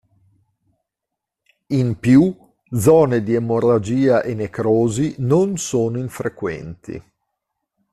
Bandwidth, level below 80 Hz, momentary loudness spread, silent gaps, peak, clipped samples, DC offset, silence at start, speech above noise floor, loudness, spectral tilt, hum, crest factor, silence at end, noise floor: 13.5 kHz; -52 dBFS; 13 LU; none; -2 dBFS; under 0.1%; under 0.1%; 1.7 s; 66 dB; -18 LUFS; -7 dB/octave; none; 16 dB; 0.95 s; -83 dBFS